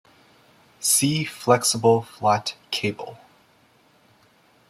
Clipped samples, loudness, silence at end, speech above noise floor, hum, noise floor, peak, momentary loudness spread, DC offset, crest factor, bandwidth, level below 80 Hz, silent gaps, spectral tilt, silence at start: under 0.1%; -21 LUFS; 1.55 s; 37 dB; none; -59 dBFS; -4 dBFS; 10 LU; under 0.1%; 22 dB; 16 kHz; -64 dBFS; none; -3.5 dB/octave; 0.8 s